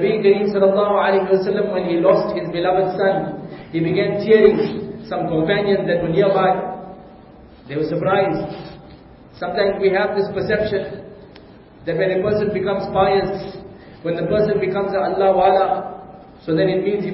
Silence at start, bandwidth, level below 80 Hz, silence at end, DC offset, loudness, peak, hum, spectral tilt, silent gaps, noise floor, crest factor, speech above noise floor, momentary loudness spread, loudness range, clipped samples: 0 s; 5.8 kHz; -48 dBFS; 0 s; under 0.1%; -18 LUFS; 0 dBFS; none; -11.5 dB/octave; none; -43 dBFS; 18 dB; 25 dB; 14 LU; 5 LU; under 0.1%